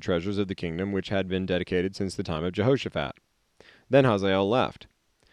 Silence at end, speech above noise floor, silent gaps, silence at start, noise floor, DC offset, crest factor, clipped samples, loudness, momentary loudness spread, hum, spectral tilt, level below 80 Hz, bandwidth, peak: 0.6 s; 32 dB; none; 0 s; -58 dBFS; under 0.1%; 20 dB; under 0.1%; -27 LUFS; 9 LU; none; -6.5 dB/octave; -56 dBFS; 11 kHz; -8 dBFS